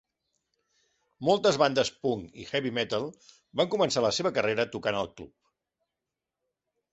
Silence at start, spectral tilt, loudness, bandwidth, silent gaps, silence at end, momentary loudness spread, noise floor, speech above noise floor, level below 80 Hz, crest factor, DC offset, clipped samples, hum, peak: 1.2 s; -4 dB/octave; -28 LUFS; 8.2 kHz; none; 1.65 s; 11 LU; -88 dBFS; 60 dB; -64 dBFS; 20 dB; under 0.1%; under 0.1%; none; -10 dBFS